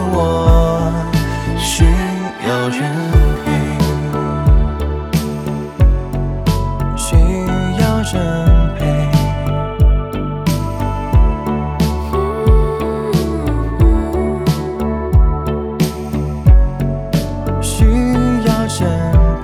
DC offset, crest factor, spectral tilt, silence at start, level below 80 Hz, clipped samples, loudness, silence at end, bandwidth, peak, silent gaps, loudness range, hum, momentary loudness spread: under 0.1%; 14 dB; -6.5 dB/octave; 0 s; -16 dBFS; under 0.1%; -16 LUFS; 0 s; 14.5 kHz; 0 dBFS; none; 2 LU; none; 6 LU